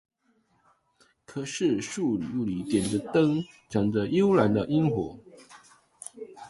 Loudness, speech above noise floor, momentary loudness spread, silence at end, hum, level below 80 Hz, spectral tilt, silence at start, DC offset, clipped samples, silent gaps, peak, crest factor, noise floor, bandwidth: -27 LUFS; 43 dB; 16 LU; 0 s; none; -58 dBFS; -6.5 dB/octave; 1.3 s; under 0.1%; under 0.1%; none; -8 dBFS; 20 dB; -69 dBFS; 11.5 kHz